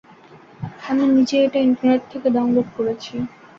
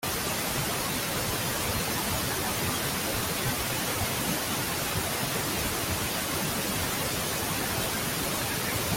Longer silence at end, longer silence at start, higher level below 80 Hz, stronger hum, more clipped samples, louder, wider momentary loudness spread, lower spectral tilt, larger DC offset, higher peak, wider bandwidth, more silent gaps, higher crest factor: first, 0.3 s vs 0 s; first, 0.6 s vs 0 s; second, -58 dBFS vs -46 dBFS; neither; neither; first, -19 LUFS vs -28 LUFS; first, 14 LU vs 1 LU; first, -6.5 dB/octave vs -3 dB/octave; neither; first, -6 dBFS vs -16 dBFS; second, 7.4 kHz vs 17 kHz; neither; about the same, 14 dB vs 14 dB